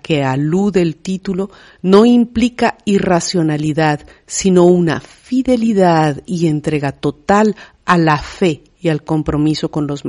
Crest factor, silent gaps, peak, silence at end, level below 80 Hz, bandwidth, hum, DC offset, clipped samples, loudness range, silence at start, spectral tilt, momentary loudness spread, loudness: 14 dB; none; 0 dBFS; 0 s; -42 dBFS; 11 kHz; none; under 0.1%; under 0.1%; 2 LU; 0.1 s; -6 dB/octave; 10 LU; -15 LUFS